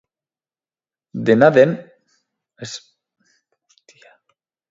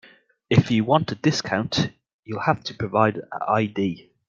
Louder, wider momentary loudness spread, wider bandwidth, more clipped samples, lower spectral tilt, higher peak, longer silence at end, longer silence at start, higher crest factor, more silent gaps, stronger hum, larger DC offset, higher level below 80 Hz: first, -14 LUFS vs -23 LUFS; first, 22 LU vs 8 LU; about the same, 7.8 kHz vs 7.4 kHz; neither; about the same, -6.5 dB/octave vs -6 dB/octave; about the same, 0 dBFS vs -2 dBFS; first, 1.95 s vs 0.3 s; first, 1.15 s vs 0.5 s; about the same, 22 dB vs 20 dB; second, none vs 2.13-2.23 s; neither; neither; second, -66 dBFS vs -56 dBFS